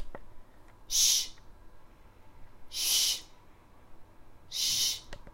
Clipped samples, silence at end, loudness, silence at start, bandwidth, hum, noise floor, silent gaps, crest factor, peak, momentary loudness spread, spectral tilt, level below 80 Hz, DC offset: under 0.1%; 0.05 s; -28 LUFS; 0 s; 16 kHz; none; -54 dBFS; none; 22 dB; -12 dBFS; 16 LU; 2 dB/octave; -52 dBFS; under 0.1%